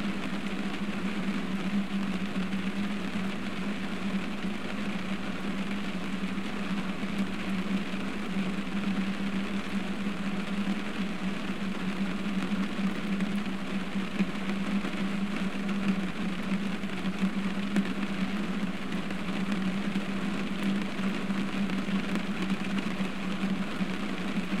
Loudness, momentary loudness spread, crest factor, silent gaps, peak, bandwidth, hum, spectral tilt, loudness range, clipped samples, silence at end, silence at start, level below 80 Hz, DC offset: -32 LUFS; 3 LU; 20 dB; none; -12 dBFS; 13 kHz; none; -6 dB/octave; 2 LU; under 0.1%; 0 s; 0 s; -54 dBFS; 2%